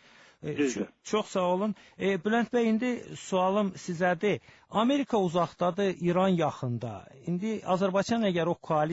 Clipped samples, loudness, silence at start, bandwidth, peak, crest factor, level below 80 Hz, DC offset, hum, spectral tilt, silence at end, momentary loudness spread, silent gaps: under 0.1%; -29 LUFS; 0.45 s; 8 kHz; -14 dBFS; 14 dB; -66 dBFS; under 0.1%; none; -6 dB/octave; 0 s; 8 LU; none